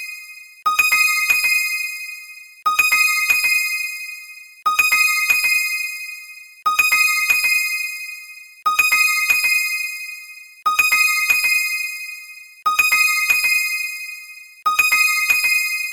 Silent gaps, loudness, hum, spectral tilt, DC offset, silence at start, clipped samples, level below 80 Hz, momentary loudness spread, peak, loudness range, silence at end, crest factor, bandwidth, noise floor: none; -16 LUFS; none; 3.5 dB/octave; under 0.1%; 0 s; under 0.1%; -60 dBFS; 18 LU; -2 dBFS; 2 LU; 0 s; 16 dB; 17.5 kHz; -39 dBFS